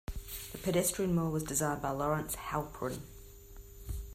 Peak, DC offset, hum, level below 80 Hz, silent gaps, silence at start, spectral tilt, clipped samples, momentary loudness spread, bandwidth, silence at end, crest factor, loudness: -18 dBFS; under 0.1%; none; -48 dBFS; none; 0.1 s; -5 dB/octave; under 0.1%; 21 LU; 16 kHz; 0 s; 18 dB; -34 LUFS